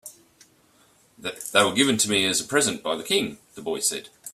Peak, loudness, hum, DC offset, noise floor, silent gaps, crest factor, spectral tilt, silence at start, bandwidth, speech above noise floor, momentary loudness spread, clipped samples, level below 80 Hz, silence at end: -2 dBFS; -22 LUFS; none; under 0.1%; -59 dBFS; none; 22 dB; -2 dB/octave; 0.05 s; 16 kHz; 35 dB; 15 LU; under 0.1%; -64 dBFS; 0.05 s